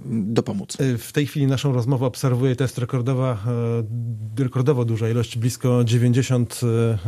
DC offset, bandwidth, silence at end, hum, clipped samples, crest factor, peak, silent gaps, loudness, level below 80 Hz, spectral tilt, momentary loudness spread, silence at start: under 0.1%; 14.5 kHz; 0 s; none; under 0.1%; 16 dB; -4 dBFS; none; -22 LUFS; -56 dBFS; -7 dB/octave; 6 LU; 0 s